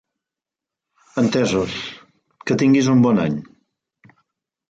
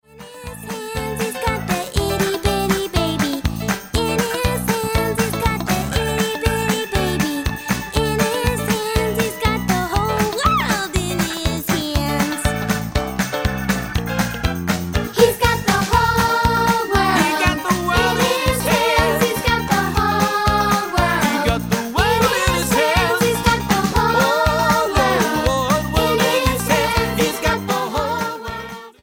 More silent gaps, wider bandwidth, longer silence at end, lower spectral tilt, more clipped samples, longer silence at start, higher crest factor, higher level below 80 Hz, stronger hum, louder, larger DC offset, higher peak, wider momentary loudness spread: neither; second, 8.8 kHz vs 17 kHz; first, 1.25 s vs 0.15 s; first, -6 dB/octave vs -4.5 dB/octave; neither; first, 1.15 s vs 0.15 s; about the same, 16 dB vs 18 dB; second, -54 dBFS vs -30 dBFS; neither; about the same, -18 LUFS vs -18 LUFS; neither; second, -6 dBFS vs 0 dBFS; first, 15 LU vs 6 LU